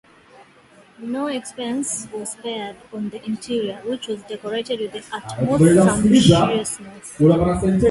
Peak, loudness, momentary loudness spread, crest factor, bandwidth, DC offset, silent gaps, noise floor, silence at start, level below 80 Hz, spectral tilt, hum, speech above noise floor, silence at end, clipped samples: 0 dBFS; -20 LUFS; 17 LU; 20 dB; 12 kHz; under 0.1%; none; -50 dBFS; 1 s; -42 dBFS; -5.5 dB/octave; none; 31 dB; 0 s; under 0.1%